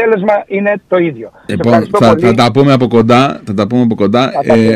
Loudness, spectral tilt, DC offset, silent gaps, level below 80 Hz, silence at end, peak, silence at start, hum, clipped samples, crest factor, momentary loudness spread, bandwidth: -10 LUFS; -7 dB/octave; under 0.1%; none; -44 dBFS; 0 s; 0 dBFS; 0 s; none; under 0.1%; 10 dB; 7 LU; 12 kHz